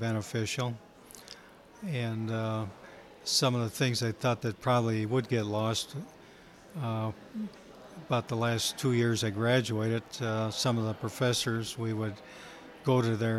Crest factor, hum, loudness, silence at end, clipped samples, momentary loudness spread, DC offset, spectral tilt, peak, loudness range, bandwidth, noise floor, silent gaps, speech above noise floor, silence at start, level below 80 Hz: 18 dB; none; -31 LUFS; 0 s; under 0.1%; 19 LU; under 0.1%; -5 dB/octave; -12 dBFS; 5 LU; 15 kHz; -54 dBFS; none; 23 dB; 0 s; -66 dBFS